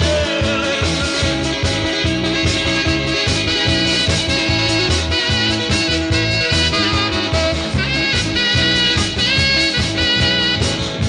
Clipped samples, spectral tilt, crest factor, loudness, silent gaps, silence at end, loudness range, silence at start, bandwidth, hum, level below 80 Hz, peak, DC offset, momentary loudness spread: under 0.1%; -4 dB/octave; 14 dB; -15 LUFS; none; 0 s; 2 LU; 0 s; 11 kHz; none; -30 dBFS; -4 dBFS; under 0.1%; 4 LU